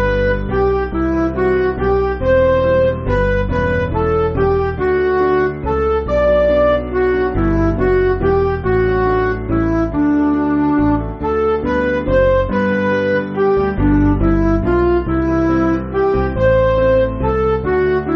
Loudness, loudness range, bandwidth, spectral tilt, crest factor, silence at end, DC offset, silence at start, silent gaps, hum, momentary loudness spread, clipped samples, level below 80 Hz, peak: -15 LUFS; 1 LU; 6.2 kHz; -7 dB/octave; 12 dB; 0 s; under 0.1%; 0 s; none; none; 4 LU; under 0.1%; -26 dBFS; -2 dBFS